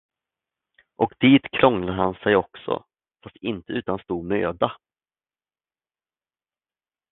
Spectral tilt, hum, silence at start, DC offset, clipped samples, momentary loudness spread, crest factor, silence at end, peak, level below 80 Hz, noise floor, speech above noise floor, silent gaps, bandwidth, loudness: -10 dB/octave; none; 1 s; under 0.1%; under 0.1%; 13 LU; 24 dB; 2.35 s; 0 dBFS; -54 dBFS; under -90 dBFS; over 68 dB; none; 4.1 kHz; -23 LUFS